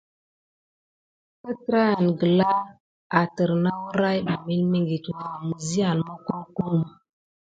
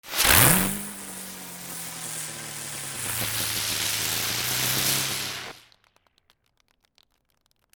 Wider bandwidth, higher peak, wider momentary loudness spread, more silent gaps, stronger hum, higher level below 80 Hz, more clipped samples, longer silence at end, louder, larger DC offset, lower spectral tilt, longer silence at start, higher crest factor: second, 9.2 kHz vs over 20 kHz; about the same, -4 dBFS vs -2 dBFS; second, 12 LU vs 18 LU; first, 2.80-3.10 s vs none; neither; second, -62 dBFS vs -48 dBFS; neither; second, 0.65 s vs 2.15 s; about the same, -24 LUFS vs -23 LUFS; neither; first, -6.5 dB/octave vs -1.5 dB/octave; first, 1.45 s vs 0.05 s; about the same, 20 dB vs 24 dB